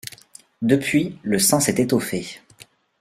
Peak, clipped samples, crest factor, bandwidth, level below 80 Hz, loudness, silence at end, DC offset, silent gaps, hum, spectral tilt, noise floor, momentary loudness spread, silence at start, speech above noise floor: -4 dBFS; under 0.1%; 18 dB; 16 kHz; -58 dBFS; -20 LUFS; 0.4 s; under 0.1%; none; none; -4 dB/octave; -51 dBFS; 19 LU; 0.05 s; 30 dB